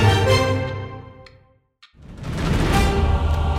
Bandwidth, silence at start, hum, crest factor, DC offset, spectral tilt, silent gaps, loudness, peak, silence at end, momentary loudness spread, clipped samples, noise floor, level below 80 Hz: 15.5 kHz; 0 s; none; 16 dB; under 0.1%; -6 dB/octave; none; -20 LUFS; -4 dBFS; 0 s; 17 LU; under 0.1%; -55 dBFS; -26 dBFS